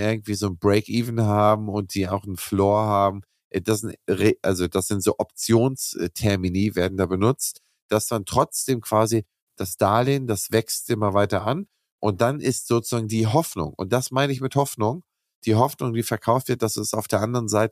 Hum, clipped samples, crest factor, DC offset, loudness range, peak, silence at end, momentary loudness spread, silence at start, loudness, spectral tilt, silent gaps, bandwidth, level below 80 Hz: none; under 0.1%; 18 dB; under 0.1%; 1 LU; -4 dBFS; 0 s; 7 LU; 0 s; -23 LUFS; -5.5 dB/octave; 3.44-3.51 s, 7.82-7.89 s, 9.42-9.47 s, 11.91-11.99 s, 15.35-15.42 s; 15.5 kHz; -54 dBFS